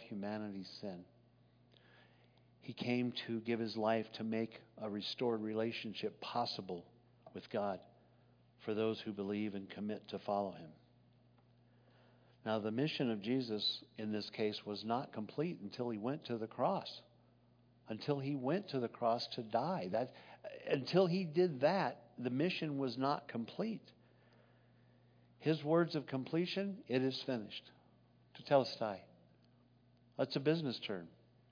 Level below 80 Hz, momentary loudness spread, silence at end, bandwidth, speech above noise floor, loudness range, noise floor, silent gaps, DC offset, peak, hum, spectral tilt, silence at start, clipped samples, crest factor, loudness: -84 dBFS; 14 LU; 0.4 s; 5.4 kHz; 30 dB; 6 LU; -69 dBFS; none; under 0.1%; -18 dBFS; 60 Hz at -70 dBFS; -4.5 dB/octave; 0 s; under 0.1%; 22 dB; -39 LUFS